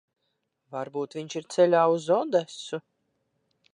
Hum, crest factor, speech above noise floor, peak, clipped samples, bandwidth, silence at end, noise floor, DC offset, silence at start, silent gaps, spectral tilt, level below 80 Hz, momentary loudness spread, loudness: none; 18 dB; 53 dB; -10 dBFS; under 0.1%; 10.5 kHz; 0.95 s; -78 dBFS; under 0.1%; 0.7 s; none; -5 dB/octave; -84 dBFS; 16 LU; -26 LUFS